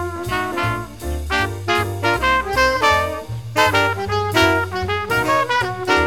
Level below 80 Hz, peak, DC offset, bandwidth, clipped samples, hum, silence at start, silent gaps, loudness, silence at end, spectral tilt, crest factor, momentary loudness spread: -36 dBFS; -2 dBFS; 0.6%; 19 kHz; under 0.1%; none; 0 s; none; -18 LUFS; 0 s; -4.5 dB/octave; 16 dB; 8 LU